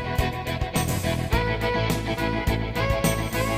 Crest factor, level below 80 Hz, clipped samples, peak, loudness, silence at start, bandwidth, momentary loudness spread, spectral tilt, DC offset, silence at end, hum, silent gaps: 18 dB; -32 dBFS; under 0.1%; -6 dBFS; -25 LUFS; 0 s; 16 kHz; 3 LU; -5 dB/octave; under 0.1%; 0 s; none; none